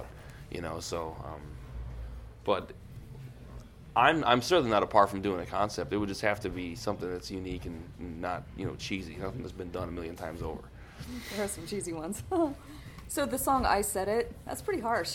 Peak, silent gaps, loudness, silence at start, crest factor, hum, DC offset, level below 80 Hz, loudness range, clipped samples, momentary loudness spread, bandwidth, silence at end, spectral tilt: -8 dBFS; none; -31 LUFS; 0 s; 24 dB; none; under 0.1%; -48 dBFS; 10 LU; under 0.1%; 21 LU; 17 kHz; 0 s; -4.5 dB/octave